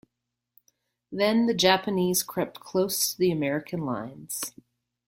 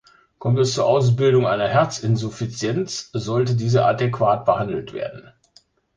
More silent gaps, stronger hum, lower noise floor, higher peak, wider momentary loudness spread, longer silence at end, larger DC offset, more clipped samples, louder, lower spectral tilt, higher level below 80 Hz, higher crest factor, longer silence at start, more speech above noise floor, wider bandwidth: neither; neither; first, -84 dBFS vs -57 dBFS; about the same, -6 dBFS vs -4 dBFS; about the same, 12 LU vs 11 LU; second, 0.6 s vs 0.75 s; neither; neither; second, -26 LUFS vs -20 LUFS; second, -3.5 dB/octave vs -6 dB/octave; second, -66 dBFS vs -54 dBFS; about the same, 22 dB vs 18 dB; first, 1.1 s vs 0.4 s; first, 58 dB vs 37 dB; first, 16.5 kHz vs 9.6 kHz